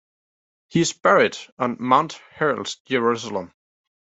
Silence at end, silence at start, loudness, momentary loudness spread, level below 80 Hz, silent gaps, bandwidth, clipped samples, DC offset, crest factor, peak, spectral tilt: 0.65 s; 0.75 s; -22 LUFS; 11 LU; -66 dBFS; 1.52-1.57 s, 2.80-2.85 s; 8.2 kHz; under 0.1%; under 0.1%; 20 dB; -2 dBFS; -4.5 dB/octave